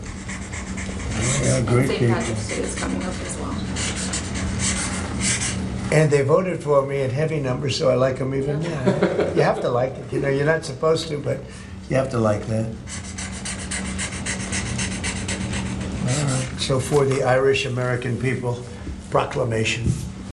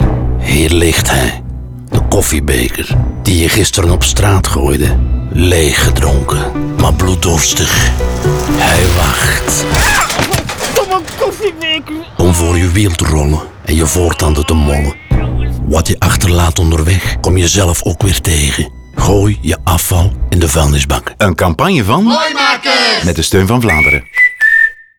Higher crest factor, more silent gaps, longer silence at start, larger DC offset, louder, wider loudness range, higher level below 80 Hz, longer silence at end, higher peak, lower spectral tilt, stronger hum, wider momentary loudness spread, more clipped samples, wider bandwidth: first, 20 dB vs 10 dB; neither; about the same, 0 s vs 0 s; second, under 0.1% vs 0.5%; second, -23 LUFS vs -11 LUFS; first, 5 LU vs 2 LU; second, -38 dBFS vs -18 dBFS; second, 0 s vs 0.2 s; second, -4 dBFS vs 0 dBFS; about the same, -5 dB/octave vs -4 dB/octave; neither; first, 10 LU vs 6 LU; neither; second, 12 kHz vs over 20 kHz